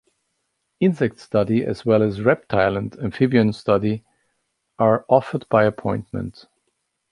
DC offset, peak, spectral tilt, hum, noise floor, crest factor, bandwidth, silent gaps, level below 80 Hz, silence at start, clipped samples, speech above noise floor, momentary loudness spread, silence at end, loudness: under 0.1%; -2 dBFS; -8.5 dB/octave; none; -74 dBFS; 18 dB; 11 kHz; none; -52 dBFS; 0.8 s; under 0.1%; 54 dB; 9 LU; 0.8 s; -20 LUFS